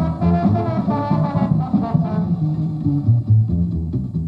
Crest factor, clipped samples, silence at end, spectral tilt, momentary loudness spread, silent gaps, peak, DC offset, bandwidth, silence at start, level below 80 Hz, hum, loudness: 14 dB; under 0.1%; 0 s; -11 dB/octave; 5 LU; none; -4 dBFS; under 0.1%; 5.2 kHz; 0 s; -36 dBFS; none; -19 LUFS